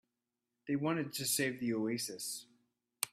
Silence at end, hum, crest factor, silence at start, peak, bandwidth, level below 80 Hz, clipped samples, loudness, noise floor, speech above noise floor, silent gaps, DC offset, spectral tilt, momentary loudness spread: 0.05 s; none; 26 dB; 0.65 s; -12 dBFS; 16 kHz; -80 dBFS; under 0.1%; -36 LUFS; -89 dBFS; 52 dB; none; under 0.1%; -3.5 dB/octave; 9 LU